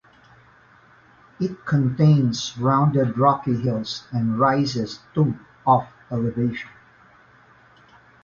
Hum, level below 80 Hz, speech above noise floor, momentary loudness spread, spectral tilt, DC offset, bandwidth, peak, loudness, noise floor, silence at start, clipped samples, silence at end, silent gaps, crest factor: none; -56 dBFS; 32 dB; 10 LU; -7 dB/octave; under 0.1%; 7.4 kHz; -4 dBFS; -22 LUFS; -53 dBFS; 1.4 s; under 0.1%; 1.55 s; none; 18 dB